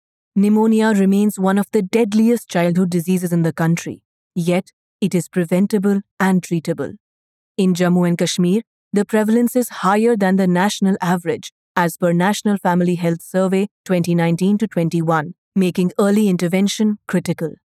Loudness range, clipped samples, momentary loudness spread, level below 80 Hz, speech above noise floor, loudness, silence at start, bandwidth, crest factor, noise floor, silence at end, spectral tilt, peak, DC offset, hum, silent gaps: 3 LU; under 0.1%; 7 LU; -66 dBFS; over 73 dB; -18 LUFS; 0.35 s; 15 kHz; 16 dB; under -90 dBFS; 0.15 s; -6.5 dB/octave; -2 dBFS; under 0.1%; none; 4.05-4.30 s, 4.73-4.99 s, 6.11-6.17 s, 7.00-7.55 s, 8.67-8.91 s, 11.52-11.75 s, 13.71-13.84 s, 15.38-15.52 s